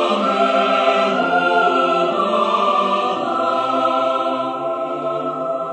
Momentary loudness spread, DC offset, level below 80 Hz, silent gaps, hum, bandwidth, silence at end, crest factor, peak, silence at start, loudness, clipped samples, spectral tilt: 7 LU; under 0.1%; -70 dBFS; none; none; 9.2 kHz; 0 s; 14 dB; -4 dBFS; 0 s; -17 LUFS; under 0.1%; -5 dB/octave